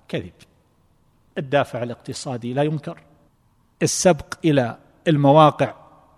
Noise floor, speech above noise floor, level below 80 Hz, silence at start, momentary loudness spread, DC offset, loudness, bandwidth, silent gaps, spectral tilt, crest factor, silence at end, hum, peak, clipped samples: -61 dBFS; 41 dB; -56 dBFS; 0.1 s; 17 LU; under 0.1%; -20 LUFS; 14 kHz; none; -5.5 dB/octave; 20 dB; 0.45 s; none; -2 dBFS; under 0.1%